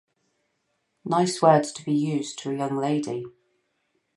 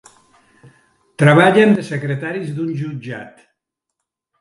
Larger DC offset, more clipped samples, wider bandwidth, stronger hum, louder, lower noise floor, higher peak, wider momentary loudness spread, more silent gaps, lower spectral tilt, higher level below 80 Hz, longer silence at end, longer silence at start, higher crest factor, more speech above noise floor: neither; neither; about the same, 11.5 kHz vs 11.5 kHz; neither; second, -24 LUFS vs -15 LUFS; second, -74 dBFS vs -79 dBFS; second, -4 dBFS vs 0 dBFS; second, 14 LU vs 18 LU; neither; second, -5.5 dB/octave vs -7 dB/octave; second, -74 dBFS vs -64 dBFS; second, 0.85 s vs 1.1 s; second, 1.05 s vs 1.2 s; about the same, 22 dB vs 18 dB; second, 51 dB vs 64 dB